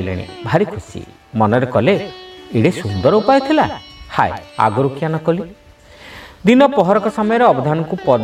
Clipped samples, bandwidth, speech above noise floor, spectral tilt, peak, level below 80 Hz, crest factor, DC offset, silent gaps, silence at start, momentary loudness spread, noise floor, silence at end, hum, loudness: under 0.1%; 13.5 kHz; 26 dB; -7 dB/octave; 0 dBFS; -46 dBFS; 16 dB; under 0.1%; none; 0 s; 19 LU; -41 dBFS; 0 s; none; -16 LUFS